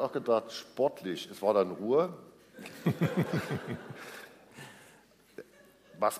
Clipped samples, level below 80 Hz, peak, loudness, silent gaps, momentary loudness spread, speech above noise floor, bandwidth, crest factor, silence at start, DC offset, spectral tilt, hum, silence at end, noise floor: under 0.1%; -72 dBFS; -14 dBFS; -32 LUFS; none; 22 LU; 29 dB; 15.5 kHz; 20 dB; 0 s; under 0.1%; -6.5 dB/octave; none; 0 s; -61 dBFS